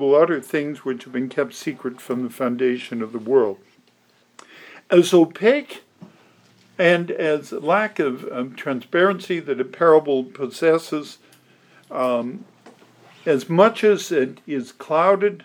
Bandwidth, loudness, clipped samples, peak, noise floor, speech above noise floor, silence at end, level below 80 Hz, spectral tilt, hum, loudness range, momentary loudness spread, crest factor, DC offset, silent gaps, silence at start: 18 kHz; -20 LUFS; under 0.1%; -2 dBFS; -59 dBFS; 40 dB; 0.05 s; -84 dBFS; -5.5 dB/octave; none; 4 LU; 13 LU; 20 dB; under 0.1%; none; 0 s